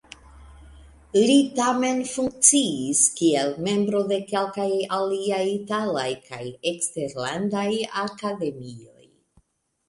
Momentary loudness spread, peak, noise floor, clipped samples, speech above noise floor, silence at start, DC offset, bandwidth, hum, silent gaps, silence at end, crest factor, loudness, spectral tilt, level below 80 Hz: 11 LU; -2 dBFS; -67 dBFS; under 0.1%; 44 dB; 0.35 s; under 0.1%; 11.5 kHz; none; none; 1.05 s; 22 dB; -23 LUFS; -3 dB/octave; -58 dBFS